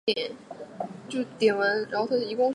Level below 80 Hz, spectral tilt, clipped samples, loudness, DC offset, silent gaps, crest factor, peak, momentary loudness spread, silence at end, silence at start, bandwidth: -76 dBFS; -4.5 dB/octave; under 0.1%; -27 LUFS; under 0.1%; none; 18 dB; -10 dBFS; 14 LU; 0 s; 0.05 s; 11.5 kHz